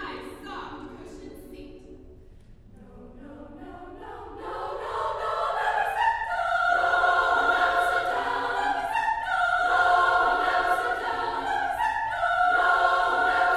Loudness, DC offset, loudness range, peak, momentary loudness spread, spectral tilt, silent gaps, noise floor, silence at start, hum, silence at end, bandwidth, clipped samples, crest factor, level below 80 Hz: -24 LUFS; under 0.1%; 20 LU; -10 dBFS; 22 LU; -3 dB/octave; none; -49 dBFS; 0 s; none; 0 s; 14 kHz; under 0.1%; 16 dB; -50 dBFS